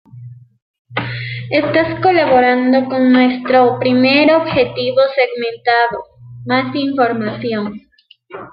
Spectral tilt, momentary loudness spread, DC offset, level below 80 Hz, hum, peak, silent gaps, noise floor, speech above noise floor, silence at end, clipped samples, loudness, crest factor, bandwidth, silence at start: -9.5 dB/octave; 12 LU; under 0.1%; -54 dBFS; none; 0 dBFS; 0.62-0.85 s; -45 dBFS; 32 dB; 0.05 s; under 0.1%; -14 LUFS; 14 dB; 5.2 kHz; 0.15 s